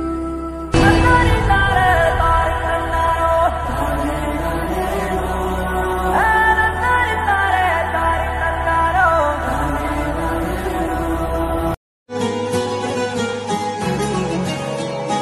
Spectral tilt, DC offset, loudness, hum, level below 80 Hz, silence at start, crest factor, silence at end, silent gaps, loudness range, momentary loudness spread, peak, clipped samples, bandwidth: -5.5 dB/octave; under 0.1%; -18 LUFS; none; -26 dBFS; 0 s; 16 dB; 0 s; 11.77-12.06 s; 6 LU; 8 LU; 0 dBFS; under 0.1%; 14.5 kHz